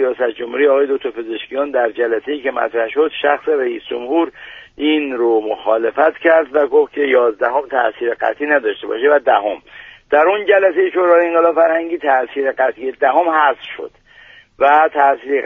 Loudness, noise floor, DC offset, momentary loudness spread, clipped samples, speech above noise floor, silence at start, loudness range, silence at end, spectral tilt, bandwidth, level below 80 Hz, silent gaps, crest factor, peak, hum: -15 LUFS; -44 dBFS; under 0.1%; 9 LU; under 0.1%; 29 dB; 0 s; 4 LU; 0 s; -5.5 dB/octave; 3.8 kHz; -58 dBFS; none; 16 dB; 0 dBFS; none